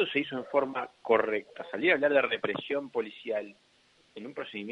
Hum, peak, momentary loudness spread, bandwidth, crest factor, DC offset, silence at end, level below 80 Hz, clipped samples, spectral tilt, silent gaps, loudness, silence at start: none; -10 dBFS; 15 LU; 7.8 kHz; 22 dB; under 0.1%; 0 s; -76 dBFS; under 0.1%; -6 dB/octave; none; -30 LUFS; 0 s